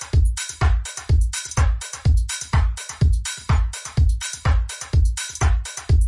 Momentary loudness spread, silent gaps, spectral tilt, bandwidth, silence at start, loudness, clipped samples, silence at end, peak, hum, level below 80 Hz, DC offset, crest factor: 3 LU; none; -4 dB/octave; 11.5 kHz; 0 s; -22 LUFS; under 0.1%; 0 s; -6 dBFS; none; -22 dBFS; under 0.1%; 12 dB